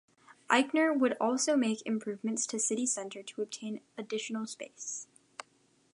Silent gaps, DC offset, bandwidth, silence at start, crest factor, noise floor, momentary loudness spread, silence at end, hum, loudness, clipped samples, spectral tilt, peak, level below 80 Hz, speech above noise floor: none; under 0.1%; 11.5 kHz; 0.5 s; 24 dB; -69 dBFS; 14 LU; 0.9 s; none; -32 LUFS; under 0.1%; -2.5 dB/octave; -8 dBFS; -88 dBFS; 37 dB